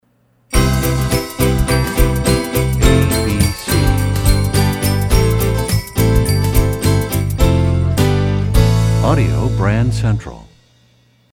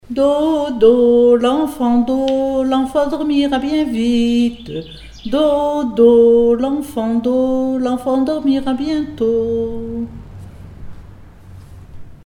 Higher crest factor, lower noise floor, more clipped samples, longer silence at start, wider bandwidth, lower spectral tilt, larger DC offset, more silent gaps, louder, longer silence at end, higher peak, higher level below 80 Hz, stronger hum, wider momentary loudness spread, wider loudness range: about the same, 14 dB vs 16 dB; first, -57 dBFS vs -38 dBFS; neither; first, 0.5 s vs 0.1 s; first, 18.5 kHz vs 15 kHz; about the same, -5.5 dB/octave vs -6.5 dB/octave; neither; neither; about the same, -15 LUFS vs -15 LUFS; first, 0.9 s vs 0.1 s; about the same, 0 dBFS vs 0 dBFS; first, -20 dBFS vs -40 dBFS; neither; second, 4 LU vs 13 LU; second, 1 LU vs 6 LU